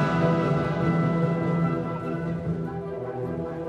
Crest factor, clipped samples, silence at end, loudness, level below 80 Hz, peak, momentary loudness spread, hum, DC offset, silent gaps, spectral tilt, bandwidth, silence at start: 14 dB; under 0.1%; 0 s; -26 LUFS; -50 dBFS; -12 dBFS; 9 LU; none; under 0.1%; none; -9 dB/octave; 7.2 kHz; 0 s